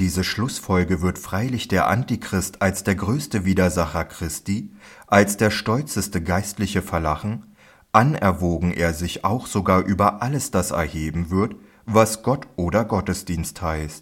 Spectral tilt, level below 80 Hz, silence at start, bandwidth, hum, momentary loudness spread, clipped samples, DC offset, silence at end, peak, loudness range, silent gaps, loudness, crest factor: -5.5 dB/octave; -44 dBFS; 0 s; 17 kHz; none; 9 LU; under 0.1%; under 0.1%; 0 s; 0 dBFS; 1 LU; none; -22 LUFS; 22 dB